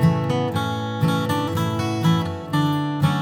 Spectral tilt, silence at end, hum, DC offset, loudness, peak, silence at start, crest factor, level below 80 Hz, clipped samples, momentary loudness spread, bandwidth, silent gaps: -6.5 dB/octave; 0 s; none; under 0.1%; -22 LUFS; -6 dBFS; 0 s; 14 dB; -54 dBFS; under 0.1%; 4 LU; 18 kHz; none